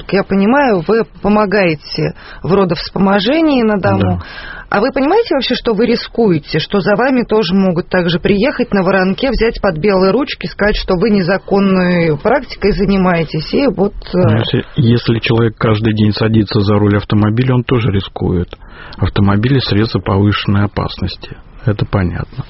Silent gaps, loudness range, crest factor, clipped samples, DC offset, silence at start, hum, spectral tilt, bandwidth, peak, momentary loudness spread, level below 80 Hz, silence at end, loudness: none; 2 LU; 12 dB; under 0.1%; under 0.1%; 0 s; none; -5.5 dB/octave; 6 kHz; 0 dBFS; 6 LU; -32 dBFS; 0 s; -13 LUFS